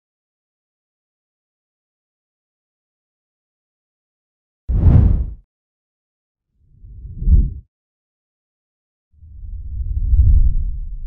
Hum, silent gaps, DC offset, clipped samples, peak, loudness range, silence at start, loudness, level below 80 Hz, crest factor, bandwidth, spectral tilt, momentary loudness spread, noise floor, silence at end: none; 5.44-6.35 s, 7.68-9.11 s; under 0.1%; under 0.1%; 0 dBFS; 6 LU; 4.7 s; -18 LUFS; -22 dBFS; 20 dB; 2.2 kHz; -12.5 dB/octave; 24 LU; -47 dBFS; 0 s